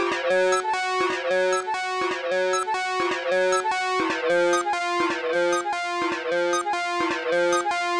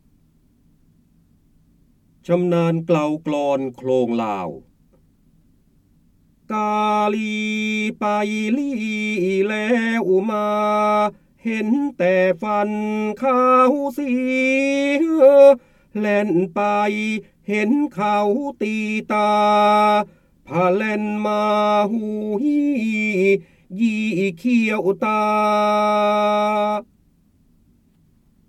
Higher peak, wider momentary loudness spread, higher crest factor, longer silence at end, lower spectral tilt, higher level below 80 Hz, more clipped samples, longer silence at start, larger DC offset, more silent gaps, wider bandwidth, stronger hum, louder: second, -14 dBFS vs -2 dBFS; second, 4 LU vs 9 LU; second, 10 dB vs 18 dB; second, 0 s vs 1.65 s; second, -2.5 dB/octave vs -6.5 dB/octave; about the same, -66 dBFS vs -62 dBFS; neither; second, 0 s vs 2.3 s; neither; neither; second, 10.5 kHz vs 13 kHz; neither; second, -23 LUFS vs -19 LUFS